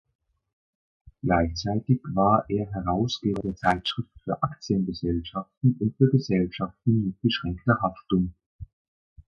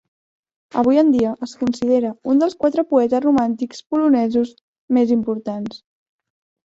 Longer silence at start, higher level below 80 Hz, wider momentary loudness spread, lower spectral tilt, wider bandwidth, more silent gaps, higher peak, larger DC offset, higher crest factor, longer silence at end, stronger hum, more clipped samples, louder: first, 1.25 s vs 0.75 s; first, -44 dBFS vs -58 dBFS; second, 8 LU vs 11 LU; about the same, -7 dB/octave vs -6.5 dB/octave; about the same, 7.2 kHz vs 7.8 kHz; second, 5.57-5.61 s, 8.46-8.59 s vs 3.86-3.90 s, 4.61-4.88 s; about the same, -6 dBFS vs -4 dBFS; neither; about the same, 20 dB vs 16 dB; second, 0.65 s vs 0.9 s; neither; neither; second, -26 LUFS vs -18 LUFS